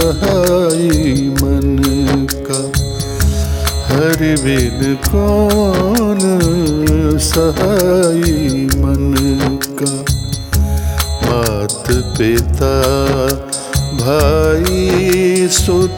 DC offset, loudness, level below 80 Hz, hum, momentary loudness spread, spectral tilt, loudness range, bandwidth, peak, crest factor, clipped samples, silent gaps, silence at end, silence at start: under 0.1%; -14 LUFS; -20 dBFS; none; 5 LU; -5 dB/octave; 3 LU; 19.5 kHz; 0 dBFS; 12 dB; under 0.1%; none; 0 s; 0 s